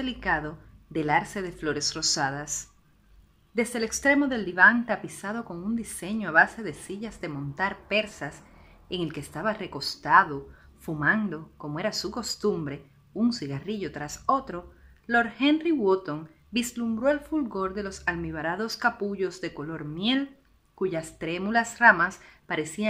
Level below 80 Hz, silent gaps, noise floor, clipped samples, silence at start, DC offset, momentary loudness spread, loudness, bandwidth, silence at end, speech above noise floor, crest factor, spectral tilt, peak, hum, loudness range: -54 dBFS; none; -58 dBFS; under 0.1%; 0 s; under 0.1%; 15 LU; -27 LUFS; 15.5 kHz; 0 s; 31 dB; 26 dB; -3.5 dB/octave; -2 dBFS; none; 5 LU